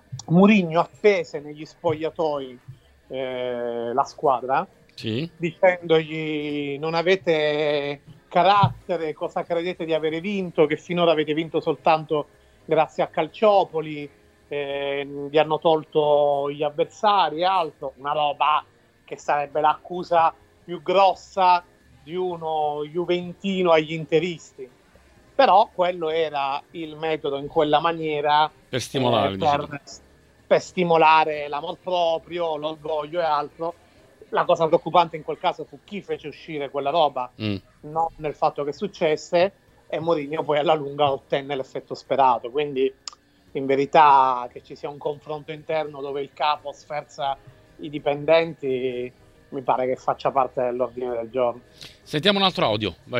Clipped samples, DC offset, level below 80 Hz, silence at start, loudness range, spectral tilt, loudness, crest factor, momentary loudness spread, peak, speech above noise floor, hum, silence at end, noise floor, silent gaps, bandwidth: under 0.1%; under 0.1%; -60 dBFS; 0.1 s; 4 LU; -6 dB/octave; -23 LUFS; 20 dB; 14 LU; -2 dBFS; 32 dB; none; 0 s; -54 dBFS; none; 12 kHz